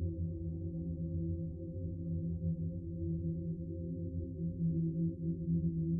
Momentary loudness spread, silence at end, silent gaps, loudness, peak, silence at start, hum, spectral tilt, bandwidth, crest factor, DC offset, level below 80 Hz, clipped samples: 6 LU; 0 s; none; -39 LUFS; -24 dBFS; 0 s; none; -19 dB/octave; 0.8 kHz; 12 dB; under 0.1%; -52 dBFS; under 0.1%